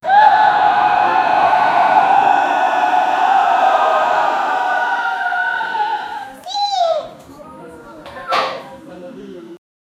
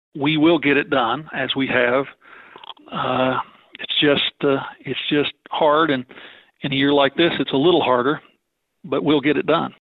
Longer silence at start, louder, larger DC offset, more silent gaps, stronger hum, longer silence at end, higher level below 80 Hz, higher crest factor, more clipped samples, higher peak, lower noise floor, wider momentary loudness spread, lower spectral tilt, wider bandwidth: about the same, 0.05 s vs 0.15 s; first, -14 LUFS vs -19 LUFS; neither; neither; neither; first, 0.45 s vs 0.2 s; about the same, -58 dBFS vs -58 dBFS; about the same, 16 dB vs 16 dB; neither; first, 0 dBFS vs -4 dBFS; second, -37 dBFS vs -71 dBFS; first, 22 LU vs 13 LU; second, -3 dB/octave vs -9 dB/octave; first, 12 kHz vs 4.9 kHz